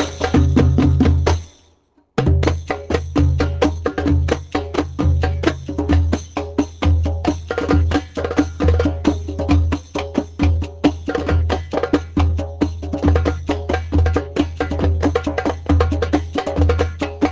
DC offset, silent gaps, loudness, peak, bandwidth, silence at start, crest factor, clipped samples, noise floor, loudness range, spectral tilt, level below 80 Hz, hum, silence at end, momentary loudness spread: under 0.1%; none; -19 LUFS; -2 dBFS; 7.8 kHz; 0 s; 16 dB; under 0.1%; -57 dBFS; 1 LU; -7.5 dB/octave; -22 dBFS; none; 0 s; 7 LU